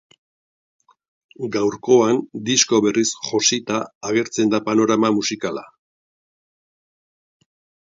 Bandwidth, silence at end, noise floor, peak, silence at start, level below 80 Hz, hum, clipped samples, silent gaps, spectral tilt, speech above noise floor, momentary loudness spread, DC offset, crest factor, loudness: 8 kHz; 2.2 s; under -90 dBFS; -2 dBFS; 1.4 s; -64 dBFS; none; under 0.1%; 3.95-4.01 s; -3 dB/octave; over 71 dB; 10 LU; under 0.1%; 20 dB; -19 LUFS